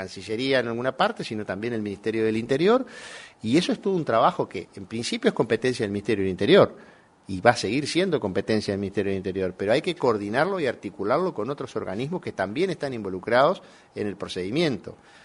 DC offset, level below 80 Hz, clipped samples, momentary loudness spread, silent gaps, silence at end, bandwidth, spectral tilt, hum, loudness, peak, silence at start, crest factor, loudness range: under 0.1%; -62 dBFS; under 0.1%; 11 LU; none; 0.3 s; 11 kHz; -5.5 dB/octave; none; -25 LUFS; 0 dBFS; 0 s; 24 dB; 3 LU